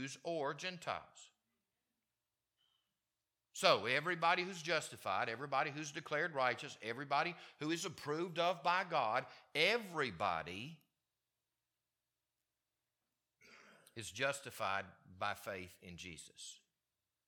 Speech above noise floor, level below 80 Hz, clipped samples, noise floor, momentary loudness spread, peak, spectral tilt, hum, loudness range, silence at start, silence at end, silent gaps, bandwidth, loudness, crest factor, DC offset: over 50 dB; -80 dBFS; under 0.1%; under -90 dBFS; 17 LU; -12 dBFS; -3.5 dB/octave; none; 11 LU; 0 s; 0.7 s; none; 18 kHz; -39 LUFS; 28 dB; under 0.1%